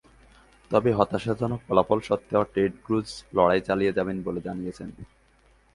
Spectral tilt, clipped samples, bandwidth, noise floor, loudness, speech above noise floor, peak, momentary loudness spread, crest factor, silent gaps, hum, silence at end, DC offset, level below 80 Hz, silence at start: -7 dB/octave; under 0.1%; 11.5 kHz; -60 dBFS; -25 LUFS; 35 dB; -4 dBFS; 11 LU; 22 dB; none; none; 0.7 s; under 0.1%; -52 dBFS; 0.7 s